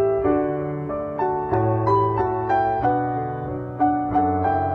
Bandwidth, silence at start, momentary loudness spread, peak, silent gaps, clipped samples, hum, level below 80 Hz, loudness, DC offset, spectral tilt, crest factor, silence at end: 5.2 kHz; 0 s; 8 LU; -8 dBFS; none; under 0.1%; none; -46 dBFS; -22 LUFS; under 0.1%; -10.5 dB/octave; 14 dB; 0 s